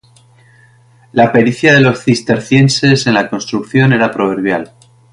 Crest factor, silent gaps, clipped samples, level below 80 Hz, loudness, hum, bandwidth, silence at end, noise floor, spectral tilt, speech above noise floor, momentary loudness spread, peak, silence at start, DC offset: 12 dB; none; under 0.1%; -48 dBFS; -11 LUFS; none; 11.5 kHz; 0.45 s; -46 dBFS; -5.5 dB/octave; 35 dB; 9 LU; 0 dBFS; 1.15 s; under 0.1%